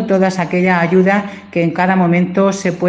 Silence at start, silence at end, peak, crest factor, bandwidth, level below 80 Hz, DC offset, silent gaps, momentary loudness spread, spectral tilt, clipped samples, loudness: 0 s; 0 s; 0 dBFS; 14 dB; 8.4 kHz; -56 dBFS; under 0.1%; none; 6 LU; -7 dB/octave; under 0.1%; -14 LUFS